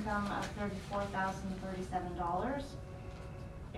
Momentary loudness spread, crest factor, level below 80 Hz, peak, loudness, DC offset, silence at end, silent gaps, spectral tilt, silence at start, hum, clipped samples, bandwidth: 11 LU; 16 dB; -50 dBFS; -24 dBFS; -39 LUFS; under 0.1%; 0 s; none; -6 dB/octave; 0 s; none; under 0.1%; 13.5 kHz